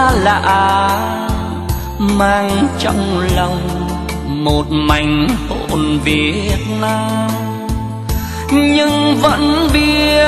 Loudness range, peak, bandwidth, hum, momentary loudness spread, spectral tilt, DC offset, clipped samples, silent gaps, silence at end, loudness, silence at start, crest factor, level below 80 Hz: 2 LU; 0 dBFS; 13 kHz; none; 9 LU; -5.5 dB/octave; under 0.1%; under 0.1%; none; 0 s; -14 LUFS; 0 s; 14 dB; -24 dBFS